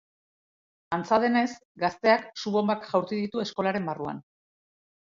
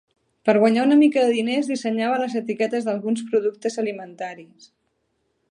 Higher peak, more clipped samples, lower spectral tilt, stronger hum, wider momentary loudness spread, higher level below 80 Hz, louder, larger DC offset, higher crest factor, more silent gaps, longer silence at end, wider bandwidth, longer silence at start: second, -8 dBFS vs -4 dBFS; neither; about the same, -5.5 dB/octave vs -5.5 dB/octave; neither; about the same, 10 LU vs 12 LU; first, -68 dBFS vs -76 dBFS; second, -27 LUFS vs -21 LUFS; neither; about the same, 20 dB vs 18 dB; first, 1.65-1.75 s vs none; second, 0.8 s vs 1.05 s; second, 7.6 kHz vs 11 kHz; first, 0.9 s vs 0.45 s